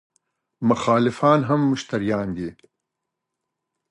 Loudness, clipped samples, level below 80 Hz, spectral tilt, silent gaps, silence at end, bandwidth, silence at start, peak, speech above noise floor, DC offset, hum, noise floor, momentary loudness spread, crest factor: -21 LUFS; under 0.1%; -56 dBFS; -7 dB/octave; none; 1.4 s; 11 kHz; 0.6 s; -4 dBFS; 62 dB; under 0.1%; none; -82 dBFS; 11 LU; 18 dB